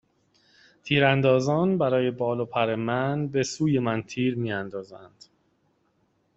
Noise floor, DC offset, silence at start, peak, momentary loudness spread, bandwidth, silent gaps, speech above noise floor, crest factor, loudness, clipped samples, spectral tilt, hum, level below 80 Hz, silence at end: -69 dBFS; under 0.1%; 0.85 s; -6 dBFS; 10 LU; 8 kHz; none; 45 dB; 22 dB; -25 LUFS; under 0.1%; -6 dB/octave; none; -62 dBFS; 1.3 s